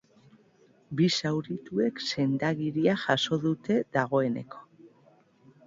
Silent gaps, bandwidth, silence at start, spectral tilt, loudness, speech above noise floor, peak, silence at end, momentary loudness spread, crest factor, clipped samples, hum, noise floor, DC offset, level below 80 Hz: none; 7.8 kHz; 0.9 s; -5.5 dB/octave; -28 LUFS; 34 dB; -8 dBFS; 0.8 s; 8 LU; 20 dB; under 0.1%; none; -62 dBFS; under 0.1%; -68 dBFS